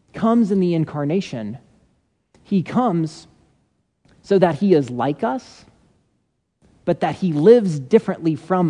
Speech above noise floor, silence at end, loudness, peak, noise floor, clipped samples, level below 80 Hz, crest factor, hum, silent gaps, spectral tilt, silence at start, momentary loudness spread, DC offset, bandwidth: 51 dB; 0 s; -19 LUFS; 0 dBFS; -69 dBFS; under 0.1%; -60 dBFS; 20 dB; none; none; -8 dB/octave; 0.15 s; 14 LU; under 0.1%; 10 kHz